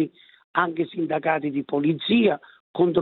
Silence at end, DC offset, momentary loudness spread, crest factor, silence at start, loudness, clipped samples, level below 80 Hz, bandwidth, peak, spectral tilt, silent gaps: 0 s; under 0.1%; 9 LU; 18 dB; 0 s; -24 LUFS; under 0.1%; -68 dBFS; 4.3 kHz; -4 dBFS; -10.5 dB/octave; 0.44-0.54 s, 2.60-2.74 s